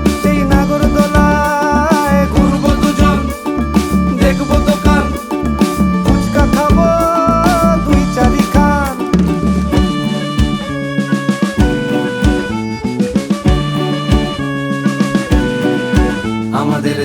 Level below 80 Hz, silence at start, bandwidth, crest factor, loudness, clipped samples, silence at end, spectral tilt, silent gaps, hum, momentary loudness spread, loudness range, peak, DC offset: -20 dBFS; 0 s; 19 kHz; 12 dB; -13 LUFS; under 0.1%; 0 s; -6.5 dB/octave; none; none; 6 LU; 4 LU; 0 dBFS; under 0.1%